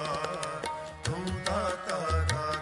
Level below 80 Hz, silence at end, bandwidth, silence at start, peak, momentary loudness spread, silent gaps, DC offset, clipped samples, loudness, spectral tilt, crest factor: -46 dBFS; 0 s; 11.5 kHz; 0 s; -10 dBFS; 7 LU; none; under 0.1%; under 0.1%; -32 LUFS; -4.5 dB/octave; 22 dB